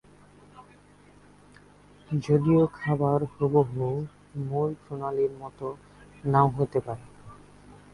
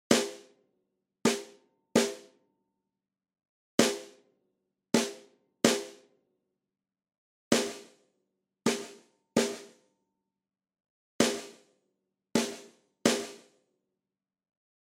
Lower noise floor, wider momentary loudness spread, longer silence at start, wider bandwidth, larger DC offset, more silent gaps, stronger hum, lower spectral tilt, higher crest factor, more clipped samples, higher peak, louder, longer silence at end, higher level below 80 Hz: second, -55 dBFS vs under -90 dBFS; second, 15 LU vs 20 LU; first, 0.55 s vs 0.1 s; second, 11 kHz vs 16 kHz; neither; second, none vs 3.49-3.78 s, 7.18-7.51 s, 10.90-11.19 s; first, 50 Hz at -45 dBFS vs none; first, -9.5 dB/octave vs -3 dB/octave; second, 20 dB vs 28 dB; neither; about the same, -8 dBFS vs -6 dBFS; first, -27 LUFS vs -30 LUFS; second, 0.2 s vs 1.5 s; first, -58 dBFS vs -76 dBFS